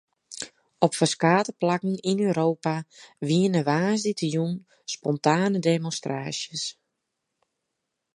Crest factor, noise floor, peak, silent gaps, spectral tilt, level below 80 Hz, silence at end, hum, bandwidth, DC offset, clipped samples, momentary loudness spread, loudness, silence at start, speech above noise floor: 24 dB; -81 dBFS; -2 dBFS; none; -5 dB/octave; -72 dBFS; 1.45 s; none; 11.5 kHz; under 0.1%; under 0.1%; 13 LU; -25 LUFS; 0.3 s; 57 dB